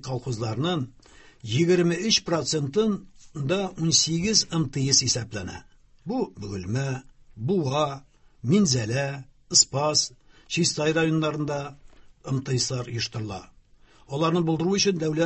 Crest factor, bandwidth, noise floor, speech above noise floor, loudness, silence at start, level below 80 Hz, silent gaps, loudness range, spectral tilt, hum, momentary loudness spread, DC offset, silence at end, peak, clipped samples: 20 dB; 8.6 kHz; -55 dBFS; 30 dB; -24 LUFS; 0.05 s; -54 dBFS; none; 6 LU; -4 dB/octave; none; 15 LU; under 0.1%; 0 s; -4 dBFS; under 0.1%